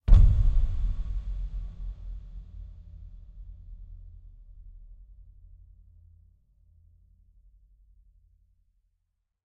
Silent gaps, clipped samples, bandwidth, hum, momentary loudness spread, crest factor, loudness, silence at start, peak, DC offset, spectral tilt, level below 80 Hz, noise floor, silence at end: none; under 0.1%; 3.7 kHz; none; 28 LU; 22 dB; -29 LUFS; 0.05 s; -6 dBFS; under 0.1%; -9 dB/octave; -28 dBFS; -78 dBFS; 4.9 s